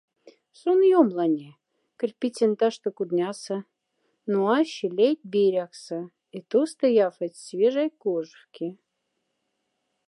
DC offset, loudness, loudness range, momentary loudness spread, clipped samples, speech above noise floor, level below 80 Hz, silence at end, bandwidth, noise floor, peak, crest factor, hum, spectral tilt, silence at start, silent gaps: under 0.1%; -25 LUFS; 3 LU; 15 LU; under 0.1%; 54 dB; -84 dBFS; 1.35 s; 11.5 kHz; -78 dBFS; -6 dBFS; 20 dB; none; -6 dB/octave; 0.65 s; none